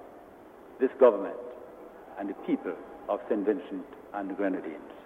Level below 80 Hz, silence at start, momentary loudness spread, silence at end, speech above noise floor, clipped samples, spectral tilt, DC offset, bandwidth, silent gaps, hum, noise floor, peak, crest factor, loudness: -70 dBFS; 0 s; 25 LU; 0 s; 21 dB; under 0.1%; -8 dB/octave; under 0.1%; 3.9 kHz; none; none; -51 dBFS; -8 dBFS; 24 dB; -30 LUFS